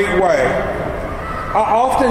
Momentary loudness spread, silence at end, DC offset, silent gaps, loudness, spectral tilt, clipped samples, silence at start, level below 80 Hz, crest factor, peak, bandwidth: 10 LU; 0 s; 0.3%; none; -17 LUFS; -5.5 dB/octave; under 0.1%; 0 s; -32 dBFS; 14 dB; -2 dBFS; 16 kHz